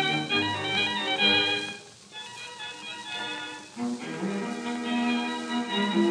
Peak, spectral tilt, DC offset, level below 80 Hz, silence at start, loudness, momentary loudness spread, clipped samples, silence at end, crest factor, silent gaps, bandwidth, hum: -10 dBFS; -3.5 dB/octave; under 0.1%; -74 dBFS; 0 s; -27 LUFS; 15 LU; under 0.1%; 0 s; 18 dB; none; 10.5 kHz; none